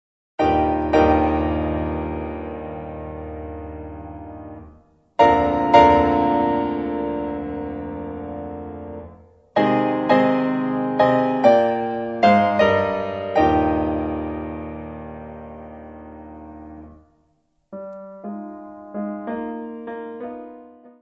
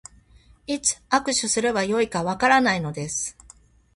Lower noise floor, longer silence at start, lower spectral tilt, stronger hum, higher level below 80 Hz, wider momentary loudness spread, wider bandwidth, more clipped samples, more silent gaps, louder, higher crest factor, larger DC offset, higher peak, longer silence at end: first, -66 dBFS vs -54 dBFS; second, 0.4 s vs 0.7 s; first, -7.5 dB/octave vs -3 dB/octave; neither; first, -40 dBFS vs -54 dBFS; first, 22 LU vs 10 LU; second, 7.4 kHz vs 11.5 kHz; neither; neither; about the same, -20 LUFS vs -22 LUFS; about the same, 22 dB vs 22 dB; neither; first, 0 dBFS vs -4 dBFS; second, 0.1 s vs 0.65 s